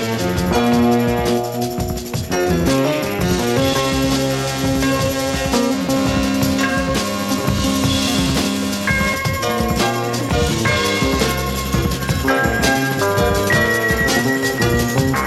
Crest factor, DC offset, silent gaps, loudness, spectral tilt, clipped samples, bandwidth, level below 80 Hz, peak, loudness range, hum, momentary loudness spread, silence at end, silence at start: 14 dB; under 0.1%; none; -17 LUFS; -4.5 dB/octave; under 0.1%; 16.5 kHz; -30 dBFS; -2 dBFS; 2 LU; none; 4 LU; 0 s; 0 s